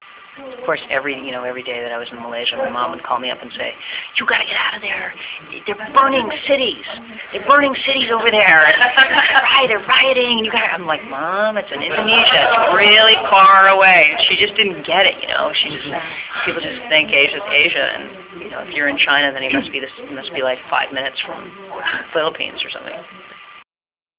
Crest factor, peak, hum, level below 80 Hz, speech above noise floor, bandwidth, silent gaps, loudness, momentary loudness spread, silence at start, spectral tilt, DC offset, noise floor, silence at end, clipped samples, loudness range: 16 dB; 0 dBFS; none; -56 dBFS; over 74 dB; 4 kHz; none; -14 LUFS; 19 LU; 0.35 s; -6 dB/octave; under 0.1%; under -90 dBFS; 0.65 s; under 0.1%; 12 LU